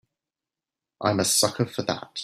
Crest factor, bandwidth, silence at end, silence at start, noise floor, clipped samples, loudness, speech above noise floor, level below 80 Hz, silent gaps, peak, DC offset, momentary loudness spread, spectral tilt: 22 dB; 15.5 kHz; 0 s; 1 s; -90 dBFS; under 0.1%; -24 LUFS; 65 dB; -64 dBFS; none; -6 dBFS; under 0.1%; 9 LU; -3 dB/octave